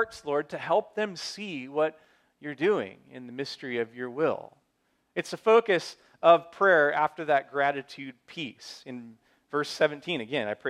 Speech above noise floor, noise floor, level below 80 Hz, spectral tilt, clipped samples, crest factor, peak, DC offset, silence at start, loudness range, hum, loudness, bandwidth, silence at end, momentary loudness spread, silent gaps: 46 dB; -73 dBFS; -76 dBFS; -4.5 dB/octave; under 0.1%; 22 dB; -6 dBFS; under 0.1%; 0 s; 8 LU; none; -27 LUFS; 12.5 kHz; 0 s; 20 LU; none